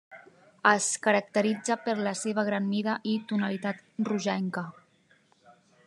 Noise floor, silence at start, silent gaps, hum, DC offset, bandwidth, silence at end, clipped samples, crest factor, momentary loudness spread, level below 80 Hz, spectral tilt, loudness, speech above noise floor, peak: -64 dBFS; 0.1 s; none; none; under 0.1%; 11.5 kHz; 1.15 s; under 0.1%; 22 dB; 9 LU; -86 dBFS; -4 dB/octave; -28 LUFS; 36 dB; -6 dBFS